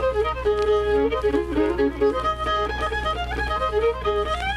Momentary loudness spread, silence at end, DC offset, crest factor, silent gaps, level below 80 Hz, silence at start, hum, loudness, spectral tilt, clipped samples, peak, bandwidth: 4 LU; 0 s; under 0.1%; 12 dB; none; -34 dBFS; 0 s; none; -23 LUFS; -6 dB/octave; under 0.1%; -10 dBFS; 11.5 kHz